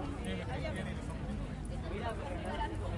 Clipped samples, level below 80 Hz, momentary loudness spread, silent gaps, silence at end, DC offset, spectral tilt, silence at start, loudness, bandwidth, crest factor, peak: under 0.1%; -44 dBFS; 3 LU; none; 0 s; under 0.1%; -6.5 dB/octave; 0 s; -40 LUFS; 11.5 kHz; 12 dB; -26 dBFS